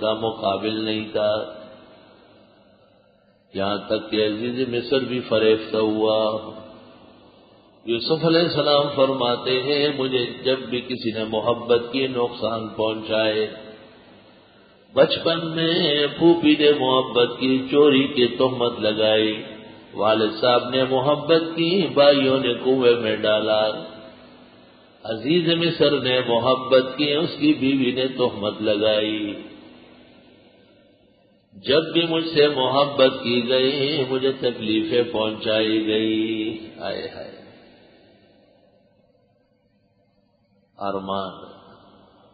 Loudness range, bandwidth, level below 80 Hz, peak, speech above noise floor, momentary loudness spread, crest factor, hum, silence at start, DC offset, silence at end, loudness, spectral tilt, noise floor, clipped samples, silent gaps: 9 LU; 5 kHz; -60 dBFS; -2 dBFS; 43 dB; 12 LU; 20 dB; none; 0 s; under 0.1%; 0.8 s; -21 LUFS; -10 dB/octave; -63 dBFS; under 0.1%; none